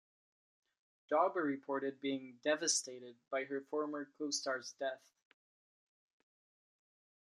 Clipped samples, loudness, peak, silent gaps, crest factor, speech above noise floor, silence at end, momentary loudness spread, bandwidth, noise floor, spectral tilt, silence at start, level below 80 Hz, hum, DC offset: under 0.1%; -38 LUFS; -18 dBFS; none; 22 dB; over 51 dB; 2.35 s; 10 LU; 12.5 kHz; under -90 dBFS; -1.5 dB/octave; 1.1 s; under -90 dBFS; none; under 0.1%